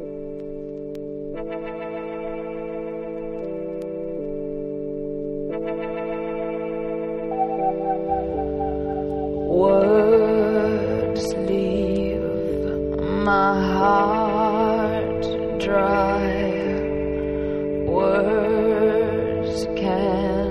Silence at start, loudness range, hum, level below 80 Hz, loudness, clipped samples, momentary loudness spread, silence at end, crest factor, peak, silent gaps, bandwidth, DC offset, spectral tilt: 0 s; 10 LU; none; -40 dBFS; -23 LUFS; under 0.1%; 12 LU; 0 s; 16 dB; -6 dBFS; none; 12 kHz; under 0.1%; -7.5 dB/octave